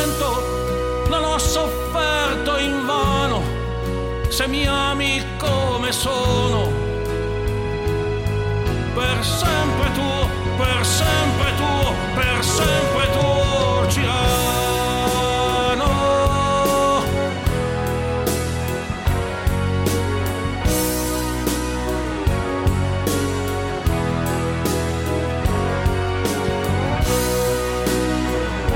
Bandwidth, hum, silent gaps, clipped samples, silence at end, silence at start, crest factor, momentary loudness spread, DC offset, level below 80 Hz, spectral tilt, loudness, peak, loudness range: 17 kHz; none; none; under 0.1%; 0 s; 0 s; 14 dB; 5 LU; under 0.1%; -28 dBFS; -4.5 dB/octave; -20 LUFS; -6 dBFS; 3 LU